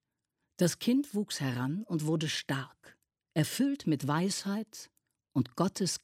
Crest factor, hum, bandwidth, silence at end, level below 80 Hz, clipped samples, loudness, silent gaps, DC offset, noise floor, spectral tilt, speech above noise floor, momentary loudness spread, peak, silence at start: 18 dB; none; 16 kHz; 0.05 s; -74 dBFS; under 0.1%; -32 LUFS; none; under 0.1%; -85 dBFS; -5 dB/octave; 53 dB; 7 LU; -14 dBFS; 0.6 s